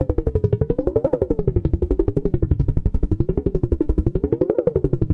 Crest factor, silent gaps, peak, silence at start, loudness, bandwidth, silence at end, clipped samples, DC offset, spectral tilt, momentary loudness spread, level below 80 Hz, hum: 16 dB; none; -4 dBFS; 0 s; -21 LUFS; 4 kHz; 0 s; under 0.1%; under 0.1%; -12 dB/octave; 2 LU; -26 dBFS; none